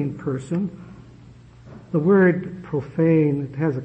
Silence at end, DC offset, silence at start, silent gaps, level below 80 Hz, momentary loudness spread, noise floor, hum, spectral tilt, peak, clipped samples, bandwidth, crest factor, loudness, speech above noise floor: 0 s; under 0.1%; 0 s; none; -54 dBFS; 12 LU; -46 dBFS; none; -9.5 dB/octave; -6 dBFS; under 0.1%; 8.6 kHz; 16 dB; -21 LUFS; 25 dB